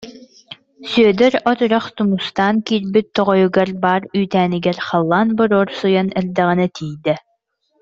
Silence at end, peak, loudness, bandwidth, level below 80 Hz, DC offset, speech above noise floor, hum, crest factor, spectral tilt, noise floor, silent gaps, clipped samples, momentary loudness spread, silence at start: 0.6 s; -2 dBFS; -16 LUFS; 7.6 kHz; -56 dBFS; under 0.1%; 50 dB; none; 16 dB; -7 dB/octave; -66 dBFS; none; under 0.1%; 6 LU; 0 s